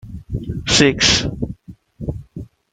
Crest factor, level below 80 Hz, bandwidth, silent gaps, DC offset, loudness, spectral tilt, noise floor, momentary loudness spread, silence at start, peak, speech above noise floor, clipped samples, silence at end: 20 dB; -36 dBFS; 11 kHz; none; under 0.1%; -15 LUFS; -3 dB/octave; -41 dBFS; 23 LU; 0.05 s; 0 dBFS; 24 dB; under 0.1%; 0.25 s